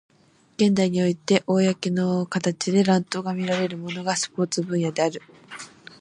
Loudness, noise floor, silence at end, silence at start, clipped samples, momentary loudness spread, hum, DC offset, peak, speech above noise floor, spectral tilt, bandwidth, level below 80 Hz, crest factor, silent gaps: -23 LUFS; -44 dBFS; 0.35 s; 0.6 s; under 0.1%; 19 LU; none; under 0.1%; -6 dBFS; 21 dB; -5.5 dB/octave; 11 kHz; -66 dBFS; 18 dB; none